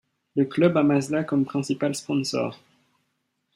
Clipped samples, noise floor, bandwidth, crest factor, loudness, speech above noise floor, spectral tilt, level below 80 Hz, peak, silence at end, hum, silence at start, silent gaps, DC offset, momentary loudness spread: under 0.1%; -75 dBFS; 12.5 kHz; 18 dB; -24 LUFS; 52 dB; -6 dB/octave; -68 dBFS; -8 dBFS; 1 s; none; 0.35 s; none; under 0.1%; 8 LU